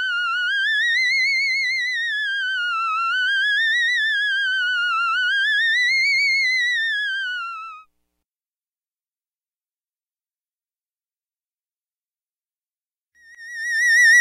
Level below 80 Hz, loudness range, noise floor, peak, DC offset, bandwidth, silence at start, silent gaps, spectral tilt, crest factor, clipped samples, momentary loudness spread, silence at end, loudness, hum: -82 dBFS; 11 LU; under -90 dBFS; -10 dBFS; under 0.1%; 15.5 kHz; 0 s; 10.81-10.85 s, 11.72-11.77 s, 12.77-12.81 s; 7.5 dB/octave; 12 dB; under 0.1%; 7 LU; 0 s; -18 LUFS; none